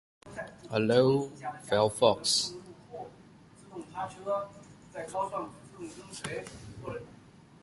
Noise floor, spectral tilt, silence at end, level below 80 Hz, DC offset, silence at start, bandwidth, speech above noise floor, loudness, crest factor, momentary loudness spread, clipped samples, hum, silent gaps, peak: -55 dBFS; -4 dB/octave; 0.5 s; -64 dBFS; under 0.1%; 0.25 s; 11.5 kHz; 25 dB; -30 LUFS; 24 dB; 21 LU; under 0.1%; none; none; -8 dBFS